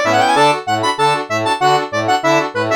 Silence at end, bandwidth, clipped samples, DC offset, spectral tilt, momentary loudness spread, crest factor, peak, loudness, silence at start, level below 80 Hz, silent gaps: 0 s; 19 kHz; under 0.1%; under 0.1%; -4 dB/octave; 5 LU; 14 dB; 0 dBFS; -14 LUFS; 0 s; -60 dBFS; none